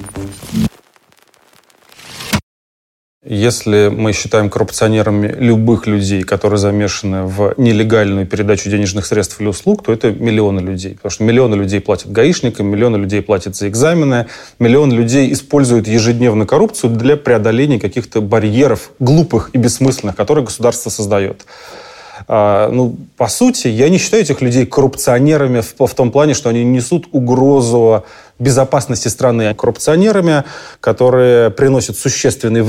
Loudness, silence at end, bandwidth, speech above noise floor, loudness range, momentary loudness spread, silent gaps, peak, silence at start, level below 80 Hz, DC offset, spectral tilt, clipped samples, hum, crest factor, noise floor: -13 LUFS; 0 s; 16 kHz; 39 dB; 3 LU; 8 LU; 2.43-3.21 s; 0 dBFS; 0 s; -44 dBFS; under 0.1%; -5.5 dB/octave; under 0.1%; none; 12 dB; -50 dBFS